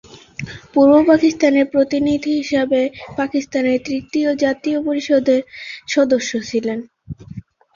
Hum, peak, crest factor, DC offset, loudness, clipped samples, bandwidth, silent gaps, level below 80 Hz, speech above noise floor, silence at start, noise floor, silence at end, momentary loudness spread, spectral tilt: none; -2 dBFS; 16 dB; under 0.1%; -17 LUFS; under 0.1%; 7.4 kHz; none; -52 dBFS; 20 dB; 0.15 s; -36 dBFS; 0.35 s; 19 LU; -5 dB/octave